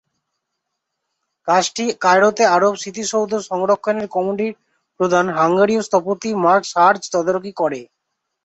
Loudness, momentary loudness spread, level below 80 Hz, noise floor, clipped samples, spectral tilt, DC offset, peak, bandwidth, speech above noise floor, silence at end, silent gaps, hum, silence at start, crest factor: -17 LUFS; 9 LU; -64 dBFS; -77 dBFS; under 0.1%; -4 dB/octave; under 0.1%; -2 dBFS; 8.2 kHz; 60 dB; 0.6 s; none; none; 1.45 s; 16 dB